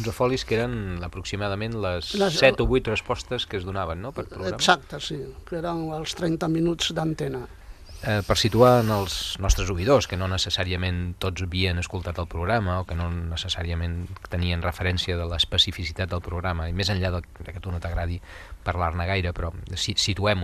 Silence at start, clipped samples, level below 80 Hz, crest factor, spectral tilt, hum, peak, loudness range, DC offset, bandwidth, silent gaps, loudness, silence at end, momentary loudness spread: 0 s; under 0.1%; -38 dBFS; 24 dB; -4.5 dB/octave; none; 0 dBFS; 6 LU; under 0.1%; 14.5 kHz; none; -25 LUFS; 0 s; 12 LU